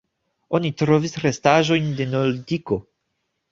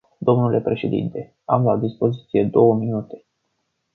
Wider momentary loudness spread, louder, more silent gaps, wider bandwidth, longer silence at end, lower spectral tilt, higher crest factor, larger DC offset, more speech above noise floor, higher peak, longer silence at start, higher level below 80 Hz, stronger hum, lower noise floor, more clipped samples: second, 9 LU vs 12 LU; about the same, -21 LUFS vs -20 LUFS; neither; first, 7.6 kHz vs 4.3 kHz; about the same, 0.7 s vs 0.8 s; second, -6 dB/octave vs -11 dB/octave; about the same, 20 dB vs 18 dB; neither; about the same, 55 dB vs 53 dB; about the same, -2 dBFS vs -2 dBFS; first, 0.5 s vs 0.2 s; about the same, -54 dBFS vs -58 dBFS; neither; about the same, -75 dBFS vs -73 dBFS; neither